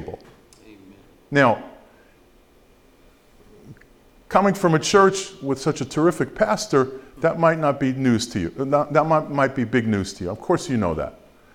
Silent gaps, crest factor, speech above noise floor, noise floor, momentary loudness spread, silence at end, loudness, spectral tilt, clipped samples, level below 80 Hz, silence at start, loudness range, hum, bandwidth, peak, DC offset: none; 20 dB; 34 dB; -54 dBFS; 10 LU; 0.45 s; -21 LUFS; -5.5 dB/octave; under 0.1%; -50 dBFS; 0 s; 7 LU; none; 16.5 kHz; -2 dBFS; under 0.1%